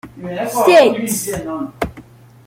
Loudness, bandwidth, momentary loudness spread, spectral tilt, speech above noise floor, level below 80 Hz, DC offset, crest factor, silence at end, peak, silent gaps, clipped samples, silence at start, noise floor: -16 LUFS; 16.5 kHz; 16 LU; -4 dB/octave; 26 dB; -44 dBFS; under 0.1%; 16 dB; 0.45 s; -2 dBFS; none; under 0.1%; 0.05 s; -41 dBFS